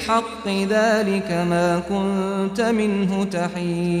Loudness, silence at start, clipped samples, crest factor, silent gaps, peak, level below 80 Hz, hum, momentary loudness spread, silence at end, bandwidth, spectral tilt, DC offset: -21 LUFS; 0 s; under 0.1%; 14 dB; none; -6 dBFS; -50 dBFS; none; 5 LU; 0 s; 14 kHz; -6 dB/octave; under 0.1%